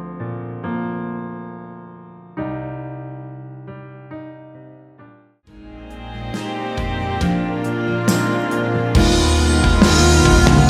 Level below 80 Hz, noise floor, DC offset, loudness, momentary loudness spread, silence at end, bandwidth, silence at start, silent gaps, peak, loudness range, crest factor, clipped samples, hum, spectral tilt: -24 dBFS; -48 dBFS; under 0.1%; -18 LUFS; 23 LU; 0 s; 15 kHz; 0 s; none; 0 dBFS; 19 LU; 18 dB; under 0.1%; none; -5 dB/octave